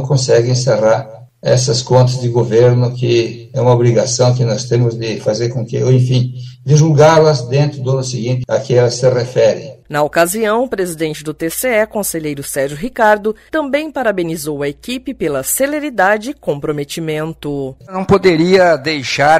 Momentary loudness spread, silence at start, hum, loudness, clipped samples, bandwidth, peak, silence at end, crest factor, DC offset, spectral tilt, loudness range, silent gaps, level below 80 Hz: 10 LU; 0 s; none; -14 LUFS; under 0.1%; 15.5 kHz; 0 dBFS; 0 s; 14 dB; under 0.1%; -5.5 dB/octave; 4 LU; none; -46 dBFS